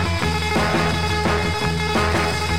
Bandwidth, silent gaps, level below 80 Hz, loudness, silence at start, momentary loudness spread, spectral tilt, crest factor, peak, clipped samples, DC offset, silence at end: 16.5 kHz; none; -32 dBFS; -20 LUFS; 0 s; 2 LU; -4.5 dB/octave; 14 dB; -6 dBFS; under 0.1%; 2%; 0 s